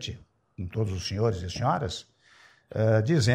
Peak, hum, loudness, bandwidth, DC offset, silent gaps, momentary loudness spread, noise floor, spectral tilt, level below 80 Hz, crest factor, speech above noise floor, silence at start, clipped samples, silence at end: -10 dBFS; none; -28 LUFS; 10.5 kHz; under 0.1%; none; 16 LU; -58 dBFS; -6 dB/octave; -52 dBFS; 18 dB; 32 dB; 0 s; under 0.1%; 0 s